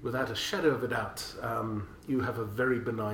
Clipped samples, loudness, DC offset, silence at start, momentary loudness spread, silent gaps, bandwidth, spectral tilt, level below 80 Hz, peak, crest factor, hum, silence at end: under 0.1%; -32 LUFS; under 0.1%; 0 s; 8 LU; none; 17 kHz; -5 dB/octave; -56 dBFS; -14 dBFS; 18 dB; none; 0 s